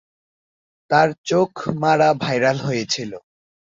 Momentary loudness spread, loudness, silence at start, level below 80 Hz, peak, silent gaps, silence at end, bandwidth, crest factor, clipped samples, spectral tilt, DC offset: 8 LU; -19 LUFS; 0.9 s; -60 dBFS; -2 dBFS; 1.18-1.24 s; 0.6 s; 7.6 kHz; 18 dB; under 0.1%; -5 dB/octave; under 0.1%